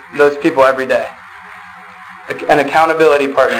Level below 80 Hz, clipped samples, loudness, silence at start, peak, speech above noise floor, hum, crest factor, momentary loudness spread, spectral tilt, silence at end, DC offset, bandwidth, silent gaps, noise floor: -52 dBFS; under 0.1%; -12 LUFS; 0.1 s; 0 dBFS; 23 dB; none; 12 dB; 23 LU; -4.5 dB/octave; 0 s; under 0.1%; 16 kHz; none; -35 dBFS